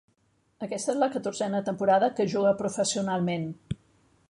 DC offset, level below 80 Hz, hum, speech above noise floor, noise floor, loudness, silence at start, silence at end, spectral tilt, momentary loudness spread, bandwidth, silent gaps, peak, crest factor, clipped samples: under 0.1%; -60 dBFS; none; 43 dB; -69 dBFS; -27 LUFS; 0.6 s; 0.55 s; -5 dB/octave; 14 LU; 11.5 kHz; none; -10 dBFS; 18 dB; under 0.1%